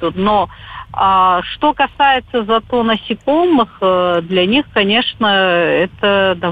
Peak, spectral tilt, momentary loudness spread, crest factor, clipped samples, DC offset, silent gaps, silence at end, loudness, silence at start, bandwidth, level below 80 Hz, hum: -2 dBFS; -7 dB/octave; 5 LU; 12 dB; under 0.1%; under 0.1%; none; 0 s; -14 LUFS; 0 s; 8 kHz; -44 dBFS; none